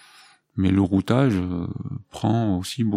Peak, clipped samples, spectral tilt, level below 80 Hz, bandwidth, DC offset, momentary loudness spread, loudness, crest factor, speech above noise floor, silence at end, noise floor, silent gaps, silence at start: -4 dBFS; under 0.1%; -7.5 dB/octave; -52 dBFS; 15.5 kHz; under 0.1%; 13 LU; -23 LUFS; 18 dB; 31 dB; 0 s; -53 dBFS; none; 0.55 s